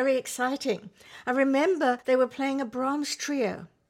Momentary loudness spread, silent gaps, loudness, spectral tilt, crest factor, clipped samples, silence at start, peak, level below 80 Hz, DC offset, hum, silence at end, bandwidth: 8 LU; none; -27 LUFS; -3.5 dB/octave; 16 dB; under 0.1%; 0 s; -10 dBFS; -74 dBFS; under 0.1%; none; 0.25 s; 16 kHz